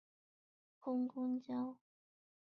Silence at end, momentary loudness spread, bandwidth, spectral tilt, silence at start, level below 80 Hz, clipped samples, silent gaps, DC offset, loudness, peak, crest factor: 0.75 s; 10 LU; 4.9 kHz; -7 dB/octave; 0.85 s; under -90 dBFS; under 0.1%; none; under 0.1%; -42 LUFS; -32 dBFS; 14 dB